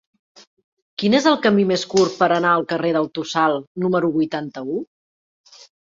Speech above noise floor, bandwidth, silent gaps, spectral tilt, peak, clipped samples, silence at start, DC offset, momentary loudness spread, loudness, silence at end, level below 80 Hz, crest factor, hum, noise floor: over 71 dB; 7.8 kHz; 3.67-3.75 s; -5 dB/octave; -2 dBFS; under 0.1%; 1 s; under 0.1%; 11 LU; -19 LUFS; 1 s; -64 dBFS; 20 dB; none; under -90 dBFS